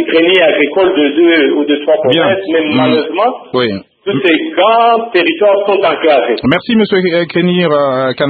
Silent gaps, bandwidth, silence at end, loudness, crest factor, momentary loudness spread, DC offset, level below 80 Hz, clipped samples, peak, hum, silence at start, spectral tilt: none; 4.8 kHz; 0 s; -10 LUFS; 10 dB; 5 LU; under 0.1%; -52 dBFS; under 0.1%; 0 dBFS; none; 0 s; -8 dB/octave